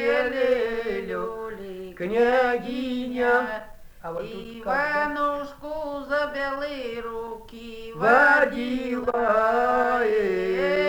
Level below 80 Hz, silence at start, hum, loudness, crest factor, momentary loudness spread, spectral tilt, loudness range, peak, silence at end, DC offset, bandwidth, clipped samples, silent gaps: -50 dBFS; 0 s; none; -24 LUFS; 18 dB; 15 LU; -5.5 dB/octave; 6 LU; -6 dBFS; 0 s; under 0.1%; over 20 kHz; under 0.1%; none